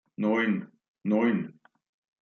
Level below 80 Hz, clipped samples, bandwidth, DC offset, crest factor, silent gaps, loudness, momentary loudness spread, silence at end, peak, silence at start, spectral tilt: -78 dBFS; under 0.1%; 6.4 kHz; under 0.1%; 16 dB; 0.88-0.95 s; -28 LUFS; 11 LU; 0.7 s; -14 dBFS; 0.2 s; -8.5 dB/octave